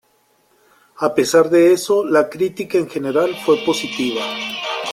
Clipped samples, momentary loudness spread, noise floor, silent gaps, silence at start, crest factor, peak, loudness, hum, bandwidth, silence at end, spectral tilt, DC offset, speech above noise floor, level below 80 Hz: under 0.1%; 10 LU; -59 dBFS; none; 1 s; 16 dB; -2 dBFS; -17 LUFS; none; 15.5 kHz; 0 s; -4 dB/octave; under 0.1%; 43 dB; -62 dBFS